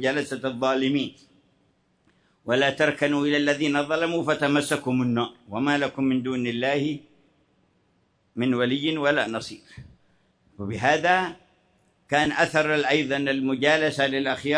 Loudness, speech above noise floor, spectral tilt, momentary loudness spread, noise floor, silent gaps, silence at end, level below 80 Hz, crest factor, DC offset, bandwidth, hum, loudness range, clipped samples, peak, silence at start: -24 LUFS; 43 dB; -5 dB/octave; 9 LU; -67 dBFS; none; 0 s; -64 dBFS; 18 dB; under 0.1%; 11 kHz; none; 5 LU; under 0.1%; -6 dBFS; 0 s